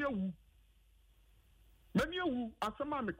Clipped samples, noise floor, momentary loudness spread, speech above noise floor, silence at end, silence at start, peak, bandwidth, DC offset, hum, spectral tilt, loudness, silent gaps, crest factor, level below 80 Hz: under 0.1%; -67 dBFS; 6 LU; 29 dB; 0 s; 0 s; -22 dBFS; 16 kHz; under 0.1%; none; -6 dB/octave; -38 LUFS; none; 18 dB; -60 dBFS